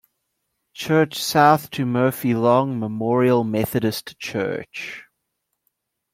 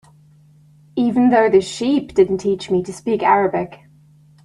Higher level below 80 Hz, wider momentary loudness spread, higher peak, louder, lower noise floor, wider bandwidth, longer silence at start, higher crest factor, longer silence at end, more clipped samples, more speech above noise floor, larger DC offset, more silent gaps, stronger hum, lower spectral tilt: second, -60 dBFS vs -54 dBFS; first, 14 LU vs 9 LU; about the same, -2 dBFS vs -2 dBFS; second, -20 LUFS vs -17 LUFS; first, -77 dBFS vs -49 dBFS; first, 16.5 kHz vs 11.5 kHz; second, 0.75 s vs 0.95 s; about the same, 20 dB vs 16 dB; first, 1.1 s vs 0.7 s; neither; first, 57 dB vs 33 dB; neither; neither; neither; about the same, -5.5 dB/octave vs -6 dB/octave